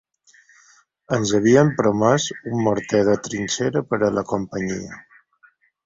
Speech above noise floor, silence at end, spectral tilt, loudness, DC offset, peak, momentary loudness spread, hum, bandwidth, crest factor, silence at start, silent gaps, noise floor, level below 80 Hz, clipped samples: 38 dB; 0.85 s; -5.5 dB/octave; -20 LUFS; under 0.1%; -2 dBFS; 11 LU; none; 7.8 kHz; 18 dB; 1.1 s; none; -58 dBFS; -54 dBFS; under 0.1%